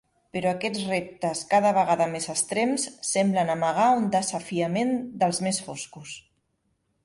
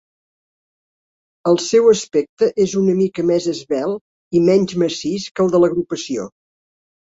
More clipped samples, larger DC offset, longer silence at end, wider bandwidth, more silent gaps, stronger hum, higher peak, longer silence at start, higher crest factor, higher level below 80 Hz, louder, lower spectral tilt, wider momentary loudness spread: neither; neither; about the same, 0.85 s vs 0.9 s; first, 11.5 kHz vs 8 kHz; second, none vs 2.29-2.37 s, 4.01-4.31 s, 5.31-5.35 s; neither; second, -8 dBFS vs -2 dBFS; second, 0.35 s vs 1.45 s; about the same, 16 dB vs 16 dB; second, -66 dBFS vs -58 dBFS; second, -25 LUFS vs -17 LUFS; second, -4 dB/octave vs -5.5 dB/octave; first, 14 LU vs 10 LU